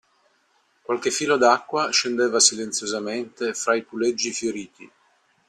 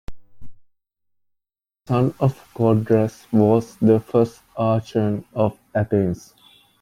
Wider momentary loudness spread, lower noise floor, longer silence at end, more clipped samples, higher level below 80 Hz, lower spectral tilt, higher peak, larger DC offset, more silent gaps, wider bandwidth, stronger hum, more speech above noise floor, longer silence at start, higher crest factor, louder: first, 12 LU vs 7 LU; second, -65 dBFS vs -84 dBFS; about the same, 0.65 s vs 0.6 s; neither; second, -70 dBFS vs -50 dBFS; second, -1.5 dB/octave vs -9 dB/octave; about the same, -2 dBFS vs -4 dBFS; neither; neither; second, 13 kHz vs 14.5 kHz; neither; second, 42 dB vs 65 dB; first, 0.9 s vs 0.1 s; about the same, 22 dB vs 18 dB; about the same, -22 LUFS vs -20 LUFS